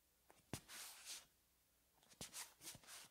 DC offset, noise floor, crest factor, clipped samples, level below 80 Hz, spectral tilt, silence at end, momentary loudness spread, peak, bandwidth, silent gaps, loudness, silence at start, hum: under 0.1%; -79 dBFS; 28 dB; under 0.1%; -80 dBFS; -1.5 dB/octave; 0 s; 4 LU; -32 dBFS; 16 kHz; none; -55 LUFS; 0 s; none